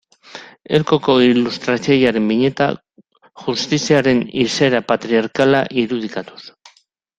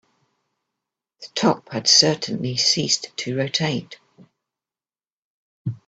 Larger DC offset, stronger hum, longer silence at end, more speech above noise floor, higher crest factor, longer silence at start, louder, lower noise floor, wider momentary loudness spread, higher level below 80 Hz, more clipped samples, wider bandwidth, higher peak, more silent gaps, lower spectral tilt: neither; neither; first, 0.7 s vs 0.1 s; second, 40 dB vs over 69 dB; second, 16 dB vs 24 dB; second, 0.35 s vs 1.2 s; first, -16 LUFS vs -19 LUFS; second, -56 dBFS vs under -90 dBFS; about the same, 15 LU vs 16 LU; first, -54 dBFS vs -64 dBFS; neither; about the same, 9 kHz vs 9.2 kHz; about the same, -2 dBFS vs 0 dBFS; second, none vs 5.12-5.65 s; first, -5 dB/octave vs -3 dB/octave